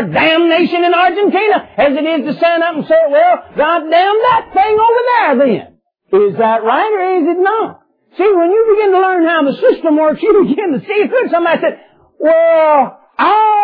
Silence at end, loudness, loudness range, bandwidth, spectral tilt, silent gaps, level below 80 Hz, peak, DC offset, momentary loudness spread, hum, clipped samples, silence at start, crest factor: 0 s; -11 LUFS; 2 LU; 5.2 kHz; -8 dB/octave; none; -54 dBFS; 0 dBFS; under 0.1%; 5 LU; none; under 0.1%; 0 s; 12 dB